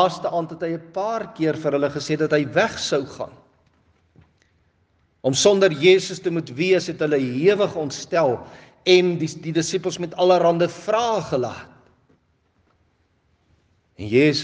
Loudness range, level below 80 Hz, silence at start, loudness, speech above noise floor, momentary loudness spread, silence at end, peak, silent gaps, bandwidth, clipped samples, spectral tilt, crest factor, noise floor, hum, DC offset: 7 LU; -64 dBFS; 0 s; -21 LUFS; 44 dB; 11 LU; 0 s; -2 dBFS; none; 9.8 kHz; under 0.1%; -4.5 dB/octave; 20 dB; -64 dBFS; none; under 0.1%